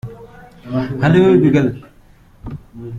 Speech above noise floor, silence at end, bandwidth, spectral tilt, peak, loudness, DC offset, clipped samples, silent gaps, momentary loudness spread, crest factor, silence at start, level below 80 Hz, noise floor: 34 dB; 0 s; 7.6 kHz; -8.5 dB/octave; -2 dBFS; -14 LUFS; under 0.1%; under 0.1%; none; 23 LU; 16 dB; 0.05 s; -44 dBFS; -46 dBFS